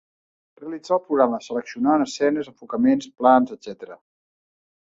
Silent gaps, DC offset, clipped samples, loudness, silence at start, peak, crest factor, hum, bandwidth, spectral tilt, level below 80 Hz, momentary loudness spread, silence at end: none; under 0.1%; under 0.1%; -21 LUFS; 0.6 s; -2 dBFS; 20 dB; none; 7.8 kHz; -5.5 dB/octave; -66 dBFS; 19 LU; 0.9 s